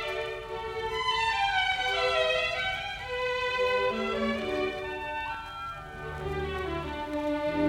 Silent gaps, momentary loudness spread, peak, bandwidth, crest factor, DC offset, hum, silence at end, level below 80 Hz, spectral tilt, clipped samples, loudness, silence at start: none; 10 LU; -14 dBFS; 16.5 kHz; 16 dB; under 0.1%; none; 0 s; -48 dBFS; -4 dB/octave; under 0.1%; -30 LUFS; 0 s